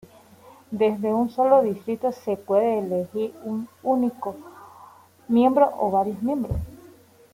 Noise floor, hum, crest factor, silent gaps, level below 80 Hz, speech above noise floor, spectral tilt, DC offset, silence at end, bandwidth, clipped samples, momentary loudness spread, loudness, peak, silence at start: -51 dBFS; none; 20 dB; none; -48 dBFS; 29 dB; -8 dB/octave; under 0.1%; 0.55 s; 16 kHz; under 0.1%; 13 LU; -23 LUFS; -4 dBFS; 0.7 s